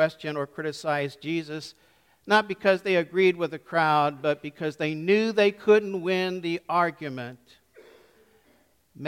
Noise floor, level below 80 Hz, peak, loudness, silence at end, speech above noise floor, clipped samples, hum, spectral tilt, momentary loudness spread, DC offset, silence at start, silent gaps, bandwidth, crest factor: -64 dBFS; -72 dBFS; -8 dBFS; -25 LUFS; 0 s; 38 dB; under 0.1%; none; -5.5 dB/octave; 12 LU; under 0.1%; 0 s; none; 14.5 kHz; 20 dB